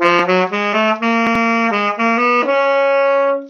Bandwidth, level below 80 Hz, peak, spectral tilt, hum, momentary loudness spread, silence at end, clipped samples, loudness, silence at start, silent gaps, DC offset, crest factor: 7 kHz; -56 dBFS; 0 dBFS; -5 dB/octave; none; 2 LU; 0 s; under 0.1%; -14 LUFS; 0 s; none; under 0.1%; 14 dB